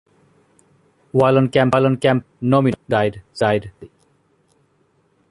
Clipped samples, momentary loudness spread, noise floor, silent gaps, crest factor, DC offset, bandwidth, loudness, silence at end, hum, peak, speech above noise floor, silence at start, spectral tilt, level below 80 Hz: under 0.1%; 8 LU; -61 dBFS; none; 18 dB; under 0.1%; 11.5 kHz; -18 LUFS; 1.45 s; none; -2 dBFS; 44 dB; 1.15 s; -7.5 dB/octave; -52 dBFS